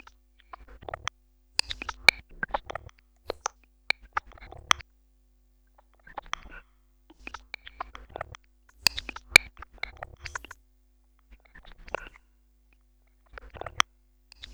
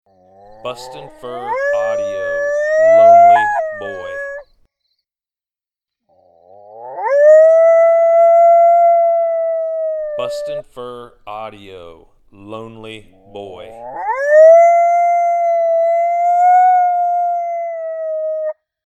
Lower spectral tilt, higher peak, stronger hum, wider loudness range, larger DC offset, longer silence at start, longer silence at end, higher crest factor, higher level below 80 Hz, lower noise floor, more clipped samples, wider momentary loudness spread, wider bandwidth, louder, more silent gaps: second, -0.5 dB/octave vs -4 dB/octave; about the same, 0 dBFS vs 0 dBFS; neither; about the same, 17 LU vs 18 LU; neither; first, 1.7 s vs 0.65 s; first, 0.7 s vs 0.35 s; first, 34 dB vs 14 dB; about the same, -52 dBFS vs -56 dBFS; second, -63 dBFS vs under -90 dBFS; neither; first, 28 LU vs 24 LU; first, over 20 kHz vs 8 kHz; second, -28 LUFS vs -12 LUFS; neither